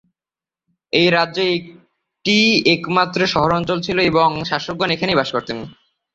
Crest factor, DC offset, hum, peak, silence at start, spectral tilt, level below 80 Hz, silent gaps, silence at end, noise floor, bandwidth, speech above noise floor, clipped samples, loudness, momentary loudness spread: 18 dB; under 0.1%; none; -2 dBFS; 0.95 s; -5 dB/octave; -50 dBFS; none; 0.45 s; under -90 dBFS; 7.8 kHz; over 73 dB; under 0.1%; -17 LUFS; 11 LU